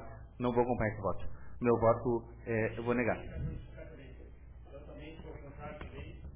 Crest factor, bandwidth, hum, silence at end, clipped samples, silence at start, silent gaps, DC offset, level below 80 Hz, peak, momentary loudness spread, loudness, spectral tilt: 18 dB; 3.8 kHz; none; 0 s; under 0.1%; 0 s; none; 0.1%; -50 dBFS; -18 dBFS; 22 LU; -34 LUFS; -7 dB/octave